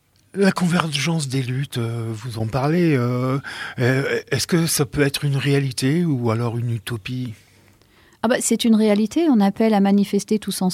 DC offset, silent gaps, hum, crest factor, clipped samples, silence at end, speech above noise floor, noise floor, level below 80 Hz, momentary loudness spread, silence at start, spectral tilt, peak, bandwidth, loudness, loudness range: under 0.1%; none; none; 20 dB; under 0.1%; 0 s; 34 dB; -54 dBFS; -52 dBFS; 10 LU; 0.35 s; -5.5 dB/octave; 0 dBFS; 16 kHz; -20 LUFS; 3 LU